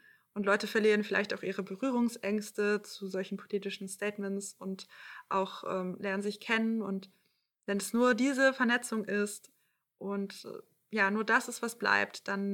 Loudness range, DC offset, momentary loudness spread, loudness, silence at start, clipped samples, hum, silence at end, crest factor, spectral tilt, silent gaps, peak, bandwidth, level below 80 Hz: 6 LU; under 0.1%; 14 LU; -32 LUFS; 0.35 s; under 0.1%; none; 0 s; 20 dB; -4.5 dB/octave; none; -14 dBFS; 18 kHz; -86 dBFS